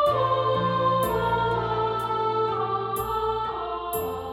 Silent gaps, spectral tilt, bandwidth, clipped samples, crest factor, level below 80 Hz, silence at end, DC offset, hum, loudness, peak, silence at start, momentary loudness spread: none; -5.5 dB/octave; 17.5 kHz; under 0.1%; 12 dB; -46 dBFS; 0 s; under 0.1%; none; -25 LUFS; -12 dBFS; 0 s; 6 LU